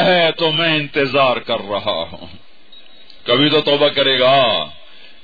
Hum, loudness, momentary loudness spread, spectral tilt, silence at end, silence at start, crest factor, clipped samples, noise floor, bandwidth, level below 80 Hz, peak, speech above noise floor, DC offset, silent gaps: none; -15 LUFS; 10 LU; -6.5 dB/octave; 0.5 s; 0 s; 14 dB; under 0.1%; -46 dBFS; 5 kHz; -54 dBFS; -2 dBFS; 30 dB; 2%; none